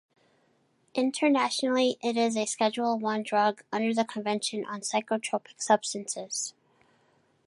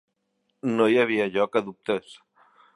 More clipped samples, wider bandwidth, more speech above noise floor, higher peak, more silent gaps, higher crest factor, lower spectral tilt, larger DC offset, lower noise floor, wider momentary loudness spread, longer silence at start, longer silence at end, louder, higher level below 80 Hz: neither; about the same, 11.5 kHz vs 11.5 kHz; second, 41 dB vs 51 dB; second, -10 dBFS vs -6 dBFS; neither; about the same, 20 dB vs 20 dB; second, -3 dB/octave vs -6 dB/octave; neither; second, -68 dBFS vs -75 dBFS; about the same, 8 LU vs 10 LU; first, 0.95 s vs 0.65 s; first, 0.95 s vs 0.65 s; second, -28 LUFS vs -24 LUFS; second, -82 dBFS vs -72 dBFS